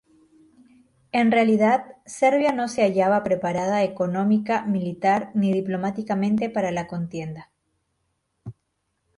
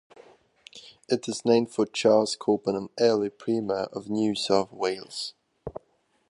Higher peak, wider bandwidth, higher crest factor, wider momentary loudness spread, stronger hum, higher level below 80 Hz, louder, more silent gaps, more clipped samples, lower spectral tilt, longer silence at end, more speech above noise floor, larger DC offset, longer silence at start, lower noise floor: about the same, -6 dBFS vs -8 dBFS; about the same, 11 kHz vs 11.5 kHz; about the same, 18 dB vs 18 dB; second, 15 LU vs 19 LU; neither; about the same, -62 dBFS vs -64 dBFS; first, -22 LUFS vs -26 LUFS; neither; neither; first, -6.5 dB/octave vs -4.5 dB/octave; about the same, 0.65 s vs 0.6 s; first, 53 dB vs 43 dB; neither; first, 1.15 s vs 0.75 s; first, -75 dBFS vs -68 dBFS